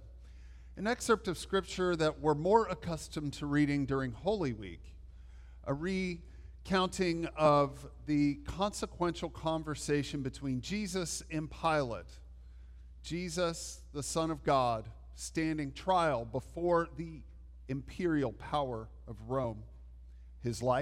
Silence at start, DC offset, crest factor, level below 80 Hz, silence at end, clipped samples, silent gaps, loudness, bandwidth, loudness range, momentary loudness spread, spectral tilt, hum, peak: 0 s; under 0.1%; 22 dB; -52 dBFS; 0 s; under 0.1%; none; -34 LUFS; 15.5 kHz; 5 LU; 21 LU; -5.5 dB/octave; none; -14 dBFS